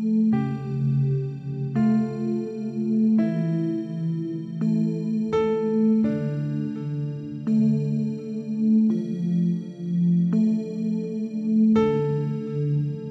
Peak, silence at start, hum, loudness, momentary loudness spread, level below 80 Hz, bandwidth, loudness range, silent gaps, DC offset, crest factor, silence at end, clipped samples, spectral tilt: -10 dBFS; 0 s; none; -24 LUFS; 8 LU; -62 dBFS; 6 kHz; 2 LU; none; under 0.1%; 12 dB; 0 s; under 0.1%; -10 dB/octave